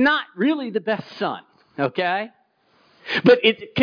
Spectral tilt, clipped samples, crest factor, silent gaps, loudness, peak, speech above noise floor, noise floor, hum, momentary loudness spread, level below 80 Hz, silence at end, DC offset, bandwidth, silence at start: -6.5 dB/octave; under 0.1%; 18 dB; none; -21 LUFS; -4 dBFS; 40 dB; -61 dBFS; none; 20 LU; -66 dBFS; 0 s; under 0.1%; 5.2 kHz; 0 s